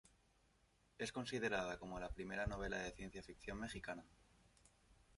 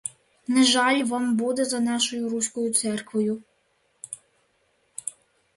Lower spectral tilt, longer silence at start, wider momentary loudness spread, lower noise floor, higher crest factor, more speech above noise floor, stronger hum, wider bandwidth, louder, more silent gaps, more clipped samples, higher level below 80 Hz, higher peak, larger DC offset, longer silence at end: first, -4.5 dB/octave vs -2.5 dB/octave; first, 1 s vs 0.05 s; second, 11 LU vs 20 LU; first, -76 dBFS vs -68 dBFS; about the same, 22 dB vs 18 dB; second, 30 dB vs 45 dB; neither; about the same, 11.5 kHz vs 11.5 kHz; second, -47 LUFS vs -24 LUFS; neither; neither; first, -60 dBFS vs -72 dBFS; second, -26 dBFS vs -8 dBFS; neither; second, 0 s vs 0.45 s